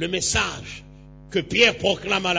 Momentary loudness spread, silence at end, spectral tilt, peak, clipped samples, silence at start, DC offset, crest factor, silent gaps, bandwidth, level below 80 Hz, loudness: 19 LU; 0 s; -2.5 dB/octave; -4 dBFS; under 0.1%; 0 s; under 0.1%; 18 dB; none; 8 kHz; -44 dBFS; -21 LUFS